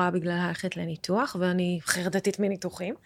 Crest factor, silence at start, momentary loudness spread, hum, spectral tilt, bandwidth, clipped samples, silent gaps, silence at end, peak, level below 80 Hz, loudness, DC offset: 20 dB; 0 s; 6 LU; none; -5 dB/octave; 15.5 kHz; under 0.1%; none; 0.1 s; -8 dBFS; -68 dBFS; -28 LUFS; under 0.1%